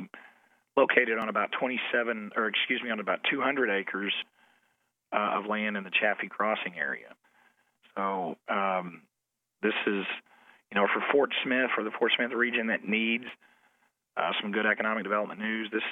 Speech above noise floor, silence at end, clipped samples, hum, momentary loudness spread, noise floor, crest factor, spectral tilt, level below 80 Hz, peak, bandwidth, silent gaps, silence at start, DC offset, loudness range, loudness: 56 dB; 0 s; under 0.1%; none; 8 LU; -85 dBFS; 24 dB; -6.5 dB/octave; -88 dBFS; -6 dBFS; 4.1 kHz; none; 0 s; under 0.1%; 5 LU; -29 LUFS